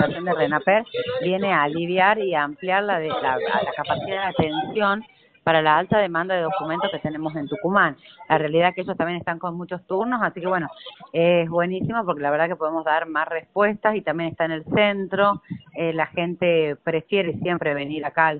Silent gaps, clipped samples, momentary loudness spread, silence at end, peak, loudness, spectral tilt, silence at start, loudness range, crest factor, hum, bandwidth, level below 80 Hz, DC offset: none; under 0.1%; 8 LU; 0 s; -4 dBFS; -22 LUFS; -3.5 dB/octave; 0 s; 2 LU; 18 dB; none; 4.6 kHz; -58 dBFS; under 0.1%